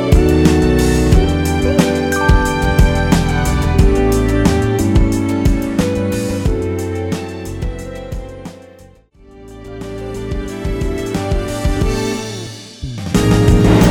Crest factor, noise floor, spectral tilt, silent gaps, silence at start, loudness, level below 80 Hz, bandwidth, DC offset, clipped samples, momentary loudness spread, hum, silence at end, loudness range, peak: 14 dB; -43 dBFS; -6.5 dB/octave; none; 0 s; -15 LUFS; -20 dBFS; 19.5 kHz; under 0.1%; under 0.1%; 16 LU; none; 0 s; 13 LU; 0 dBFS